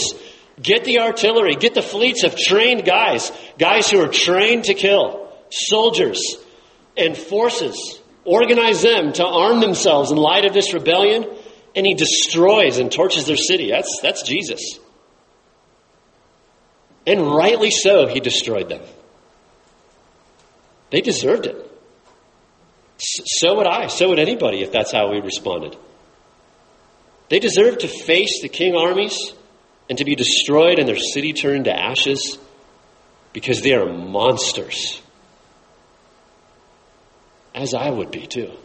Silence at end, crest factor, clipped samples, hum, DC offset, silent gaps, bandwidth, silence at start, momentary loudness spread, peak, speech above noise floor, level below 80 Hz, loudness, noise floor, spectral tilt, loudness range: 0.1 s; 18 dB; under 0.1%; none; under 0.1%; none; 8.8 kHz; 0 s; 14 LU; -2 dBFS; 39 dB; -60 dBFS; -16 LUFS; -56 dBFS; -2.5 dB/octave; 9 LU